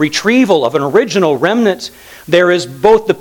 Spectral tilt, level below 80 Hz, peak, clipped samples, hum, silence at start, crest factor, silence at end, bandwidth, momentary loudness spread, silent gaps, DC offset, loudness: -5 dB/octave; -50 dBFS; 0 dBFS; 0.2%; none; 0 s; 12 dB; 0 s; 19 kHz; 4 LU; none; under 0.1%; -12 LUFS